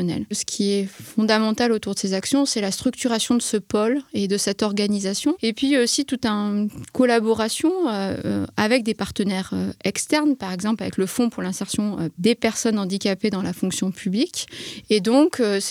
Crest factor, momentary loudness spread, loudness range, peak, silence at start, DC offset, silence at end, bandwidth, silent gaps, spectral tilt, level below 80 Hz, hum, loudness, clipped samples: 18 dB; 6 LU; 2 LU; -4 dBFS; 0 s; under 0.1%; 0 s; 16 kHz; none; -4 dB/octave; -56 dBFS; none; -22 LUFS; under 0.1%